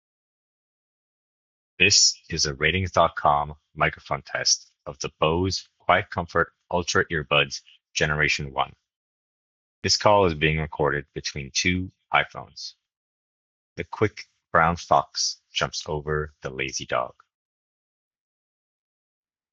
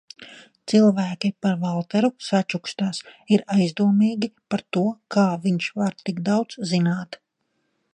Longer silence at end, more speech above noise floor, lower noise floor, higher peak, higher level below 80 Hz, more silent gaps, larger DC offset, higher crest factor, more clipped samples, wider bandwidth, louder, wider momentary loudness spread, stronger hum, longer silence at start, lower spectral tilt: first, 2.45 s vs 0.8 s; first, over 66 dB vs 51 dB; first, under -90 dBFS vs -73 dBFS; about the same, -4 dBFS vs -4 dBFS; first, -50 dBFS vs -70 dBFS; first, 8.96-9.82 s, 12.97-13.76 s vs none; neither; about the same, 22 dB vs 18 dB; neither; second, 8.2 kHz vs 9.6 kHz; about the same, -23 LUFS vs -22 LUFS; first, 13 LU vs 10 LU; neither; first, 1.8 s vs 0.2 s; second, -3 dB/octave vs -6.5 dB/octave